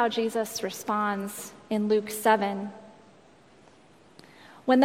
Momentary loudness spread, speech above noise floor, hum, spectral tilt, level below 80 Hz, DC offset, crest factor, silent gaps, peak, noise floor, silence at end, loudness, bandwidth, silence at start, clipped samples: 13 LU; 29 dB; none; -4.5 dB/octave; -74 dBFS; under 0.1%; 22 dB; none; -8 dBFS; -56 dBFS; 0 s; -28 LUFS; 16.5 kHz; 0 s; under 0.1%